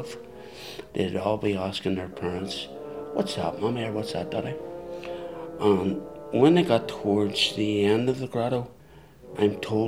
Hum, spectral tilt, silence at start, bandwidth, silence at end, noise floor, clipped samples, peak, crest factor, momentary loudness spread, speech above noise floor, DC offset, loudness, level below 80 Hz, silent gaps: none; -6 dB/octave; 0 s; 15.5 kHz; 0 s; -50 dBFS; under 0.1%; -6 dBFS; 20 dB; 15 LU; 25 dB; 0.2%; -26 LUFS; -58 dBFS; none